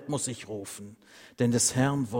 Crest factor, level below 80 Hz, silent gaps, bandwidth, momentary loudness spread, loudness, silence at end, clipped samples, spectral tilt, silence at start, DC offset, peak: 18 dB; -62 dBFS; none; 16.5 kHz; 18 LU; -28 LUFS; 0 s; under 0.1%; -4.5 dB/octave; 0 s; under 0.1%; -12 dBFS